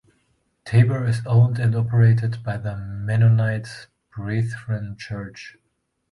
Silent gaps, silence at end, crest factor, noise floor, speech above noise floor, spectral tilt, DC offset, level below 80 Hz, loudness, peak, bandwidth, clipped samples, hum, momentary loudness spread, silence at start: none; 0.6 s; 16 dB; -73 dBFS; 53 dB; -8 dB/octave; under 0.1%; -50 dBFS; -21 LUFS; -6 dBFS; 11 kHz; under 0.1%; none; 19 LU; 0.65 s